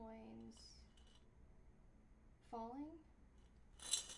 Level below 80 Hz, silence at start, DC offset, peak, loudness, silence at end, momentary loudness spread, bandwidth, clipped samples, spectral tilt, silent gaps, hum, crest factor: -68 dBFS; 0 s; under 0.1%; -24 dBFS; -51 LUFS; 0 s; 24 LU; 11.5 kHz; under 0.1%; -1.5 dB/octave; none; none; 30 dB